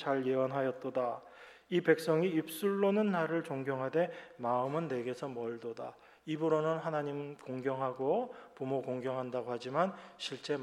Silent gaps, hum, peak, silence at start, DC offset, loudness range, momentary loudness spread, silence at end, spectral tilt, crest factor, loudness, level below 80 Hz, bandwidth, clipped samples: none; none; -14 dBFS; 0 s; under 0.1%; 4 LU; 12 LU; 0 s; -6.5 dB/octave; 20 dB; -35 LUFS; -82 dBFS; 15 kHz; under 0.1%